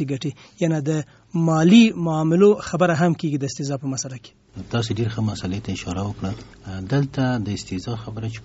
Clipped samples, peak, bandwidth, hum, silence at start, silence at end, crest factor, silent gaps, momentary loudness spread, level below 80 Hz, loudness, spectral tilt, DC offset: under 0.1%; -2 dBFS; 8 kHz; none; 0 s; 0 s; 20 dB; none; 15 LU; -50 dBFS; -21 LUFS; -6.5 dB/octave; under 0.1%